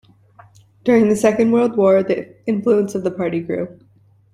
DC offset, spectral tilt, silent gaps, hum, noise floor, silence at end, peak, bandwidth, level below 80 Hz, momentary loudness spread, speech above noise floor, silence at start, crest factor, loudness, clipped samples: under 0.1%; -7 dB/octave; none; none; -48 dBFS; 0.65 s; -2 dBFS; 13 kHz; -58 dBFS; 10 LU; 32 dB; 0.85 s; 16 dB; -17 LUFS; under 0.1%